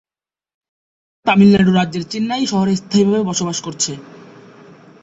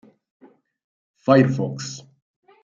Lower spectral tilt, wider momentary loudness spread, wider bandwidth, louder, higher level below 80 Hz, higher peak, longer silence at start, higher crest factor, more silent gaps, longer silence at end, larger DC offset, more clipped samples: second, -5 dB/octave vs -6.5 dB/octave; second, 11 LU vs 17 LU; about the same, 8 kHz vs 7.6 kHz; first, -16 LUFS vs -20 LUFS; first, -52 dBFS vs -64 dBFS; about the same, -2 dBFS vs -2 dBFS; about the same, 1.25 s vs 1.25 s; second, 16 dB vs 22 dB; neither; first, 0.8 s vs 0.65 s; neither; neither